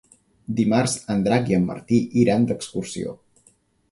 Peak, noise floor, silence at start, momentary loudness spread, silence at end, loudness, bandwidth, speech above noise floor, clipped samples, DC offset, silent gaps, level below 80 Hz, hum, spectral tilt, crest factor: -4 dBFS; -60 dBFS; 0.5 s; 12 LU; 0.75 s; -22 LUFS; 11.5 kHz; 39 dB; under 0.1%; under 0.1%; none; -54 dBFS; none; -6 dB/octave; 18 dB